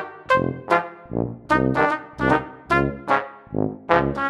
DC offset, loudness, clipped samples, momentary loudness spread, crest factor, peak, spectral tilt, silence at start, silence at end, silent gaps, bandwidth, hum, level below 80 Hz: under 0.1%; -22 LUFS; under 0.1%; 8 LU; 20 dB; -2 dBFS; -7 dB/octave; 0 s; 0 s; none; 11.5 kHz; none; -42 dBFS